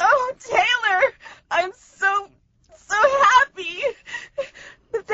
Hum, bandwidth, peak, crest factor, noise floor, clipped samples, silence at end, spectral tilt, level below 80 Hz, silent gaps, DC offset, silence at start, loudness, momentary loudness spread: none; 8 kHz; -4 dBFS; 18 dB; -54 dBFS; under 0.1%; 0 s; 2 dB/octave; -58 dBFS; none; under 0.1%; 0 s; -20 LUFS; 17 LU